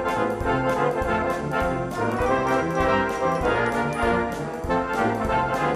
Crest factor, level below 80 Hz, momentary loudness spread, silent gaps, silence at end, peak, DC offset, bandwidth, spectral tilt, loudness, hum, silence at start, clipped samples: 16 dB; -38 dBFS; 4 LU; none; 0 s; -8 dBFS; under 0.1%; 15.5 kHz; -6 dB/octave; -23 LUFS; none; 0 s; under 0.1%